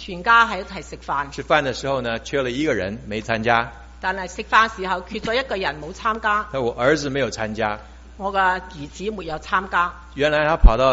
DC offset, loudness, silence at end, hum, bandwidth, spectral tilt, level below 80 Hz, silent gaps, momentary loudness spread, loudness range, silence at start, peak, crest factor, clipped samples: under 0.1%; -21 LUFS; 0 s; none; 8 kHz; -3 dB/octave; -28 dBFS; none; 12 LU; 2 LU; 0 s; 0 dBFS; 22 dB; under 0.1%